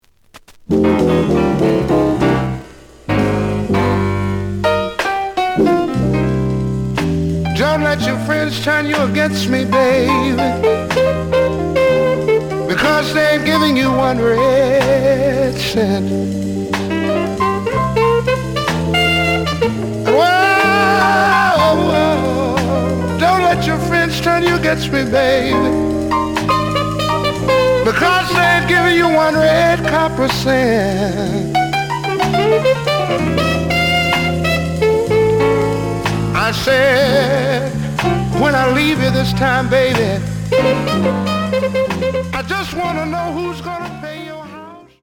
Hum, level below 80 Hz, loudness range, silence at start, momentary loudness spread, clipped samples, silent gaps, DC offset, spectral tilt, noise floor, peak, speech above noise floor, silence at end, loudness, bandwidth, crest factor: none; -36 dBFS; 4 LU; 0.35 s; 7 LU; under 0.1%; none; under 0.1%; -5.5 dB/octave; -45 dBFS; -2 dBFS; 31 dB; 0.25 s; -15 LUFS; 19.5 kHz; 14 dB